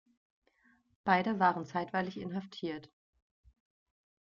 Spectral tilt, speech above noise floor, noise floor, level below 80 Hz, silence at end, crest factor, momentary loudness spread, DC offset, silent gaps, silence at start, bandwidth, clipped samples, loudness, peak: -4 dB/octave; 37 dB; -70 dBFS; -72 dBFS; 1.35 s; 24 dB; 11 LU; under 0.1%; none; 1.05 s; 7.2 kHz; under 0.1%; -33 LUFS; -14 dBFS